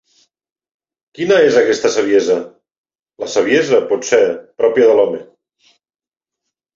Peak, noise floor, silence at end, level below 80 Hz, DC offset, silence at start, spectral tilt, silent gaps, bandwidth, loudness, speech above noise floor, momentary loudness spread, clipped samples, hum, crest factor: -2 dBFS; under -90 dBFS; 1.5 s; -62 dBFS; under 0.1%; 1.2 s; -4 dB/octave; 2.78-2.84 s; 7.8 kHz; -14 LUFS; over 77 dB; 10 LU; under 0.1%; none; 14 dB